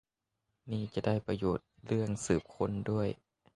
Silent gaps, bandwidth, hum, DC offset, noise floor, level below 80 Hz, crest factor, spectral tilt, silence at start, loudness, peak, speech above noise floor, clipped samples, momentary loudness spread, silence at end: none; 11.5 kHz; none; under 0.1%; -85 dBFS; -56 dBFS; 20 dB; -6.5 dB/octave; 0.65 s; -35 LUFS; -14 dBFS; 52 dB; under 0.1%; 7 LU; 0.4 s